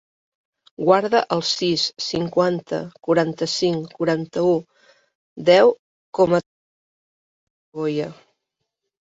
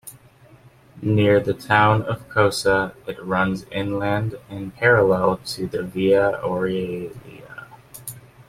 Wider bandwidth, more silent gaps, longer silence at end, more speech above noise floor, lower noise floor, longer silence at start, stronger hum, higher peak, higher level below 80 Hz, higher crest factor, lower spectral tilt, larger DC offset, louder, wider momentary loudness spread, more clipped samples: second, 7.8 kHz vs 16 kHz; first, 5.15-5.36 s, 5.79-6.13 s, 6.46-7.72 s vs none; first, 0.9 s vs 0.05 s; first, 60 dB vs 30 dB; first, -80 dBFS vs -50 dBFS; first, 0.8 s vs 0.05 s; neither; about the same, -2 dBFS vs -2 dBFS; second, -62 dBFS vs -52 dBFS; about the same, 20 dB vs 18 dB; about the same, -5 dB/octave vs -6 dB/octave; neither; about the same, -20 LUFS vs -20 LUFS; second, 11 LU vs 20 LU; neither